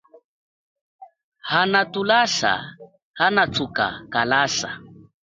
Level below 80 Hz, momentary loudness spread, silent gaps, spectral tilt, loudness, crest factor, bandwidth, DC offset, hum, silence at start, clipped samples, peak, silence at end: -58 dBFS; 12 LU; 1.23-1.32 s, 3.02-3.14 s; -3 dB/octave; -20 LUFS; 20 dB; 9.4 kHz; under 0.1%; none; 1 s; under 0.1%; -4 dBFS; 0.3 s